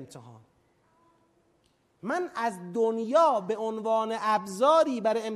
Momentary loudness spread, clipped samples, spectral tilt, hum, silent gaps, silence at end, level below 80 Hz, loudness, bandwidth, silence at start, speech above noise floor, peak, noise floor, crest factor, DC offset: 9 LU; under 0.1%; -5 dB/octave; none; none; 0 s; -78 dBFS; -26 LUFS; 13 kHz; 0 s; 42 dB; -10 dBFS; -68 dBFS; 18 dB; under 0.1%